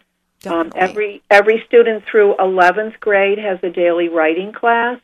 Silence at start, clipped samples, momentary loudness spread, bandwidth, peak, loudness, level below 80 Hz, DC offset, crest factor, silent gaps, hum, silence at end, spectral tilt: 0.45 s; under 0.1%; 9 LU; 11 kHz; 0 dBFS; -14 LUFS; -62 dBFS; under 0.1%; 14 dB; none; none; 0.05 s; -5.5 dB/octave